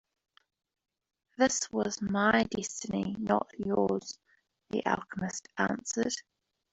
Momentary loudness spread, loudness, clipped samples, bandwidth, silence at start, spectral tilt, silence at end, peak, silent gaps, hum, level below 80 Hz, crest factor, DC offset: 10 LU; -31 LUFS; under 0.1%; 8.2 kHz; 1.4 s; -4 dB/octave; 0.5 s; -10 dBFS; none; none; -64 dBFS; 24 dB; under 0.1%